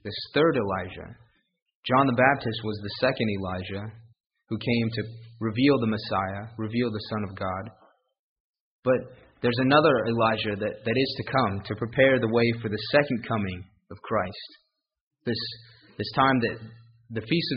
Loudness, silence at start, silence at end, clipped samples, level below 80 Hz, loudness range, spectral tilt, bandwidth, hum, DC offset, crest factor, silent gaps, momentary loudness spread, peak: -26 LUFS; 0.05 s; 0 s; under 0.1%; -58 dBFS; 6 LU; -4.5 dB/octave; 5.4 kHz; none; under 0.1%; 22 dB; 1.62-1.66 s, 1.75-1.83 s, 4.20-4.24 s, 8.19-8.54 s, 8.60-8.83 s, 15.01-15.11 s; 16 LU; -6 dBFS